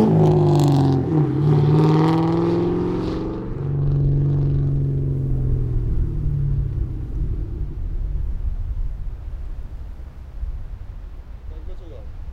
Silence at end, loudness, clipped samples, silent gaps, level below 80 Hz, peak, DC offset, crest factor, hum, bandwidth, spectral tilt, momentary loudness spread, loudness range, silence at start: 0 s; -21 LUFS; under 0.1%; none; -28 dBFS; -4 dBFS; under 0.1%; 16 dB; none; 8.2 kHz; -9.5 dB/octave; 21 LU; 15 LU; 0 s